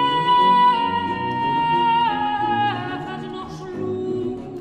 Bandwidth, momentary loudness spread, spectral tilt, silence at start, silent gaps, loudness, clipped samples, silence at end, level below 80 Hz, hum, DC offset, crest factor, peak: 8.8 kHz; 15 LU; -6 dB/octave; 0 s; none; -20 LUFS; under 0.1%; 0 s; -54 dBFS; none; under 0.1%; 14 dB; -8 dBFS